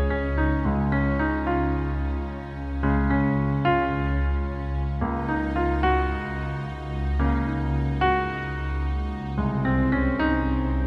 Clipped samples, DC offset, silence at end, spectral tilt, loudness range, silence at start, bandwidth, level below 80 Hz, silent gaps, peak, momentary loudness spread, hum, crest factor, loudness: under 0.1%; under 0.1%; 0 s; -9 dB/octave; 2 LU; 0 s; 5.4 kHz; -28 dBFS; none; -8 dBFS; 7 LU; none; 14 dB; -25 LUFS